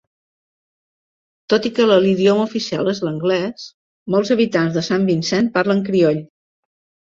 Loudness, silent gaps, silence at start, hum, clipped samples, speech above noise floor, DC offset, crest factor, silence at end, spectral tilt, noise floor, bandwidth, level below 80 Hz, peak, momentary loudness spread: -17 LUFS; 3.74-4.06 s; 1.5 s; none; under 0.1%; over 73 dB; under 0.1%; 18 dB; 0.8 s; -6 dB/octave; under -90 dBFS; 7.8 kHz; -60 dBFS; -2 dBFS; 8 LU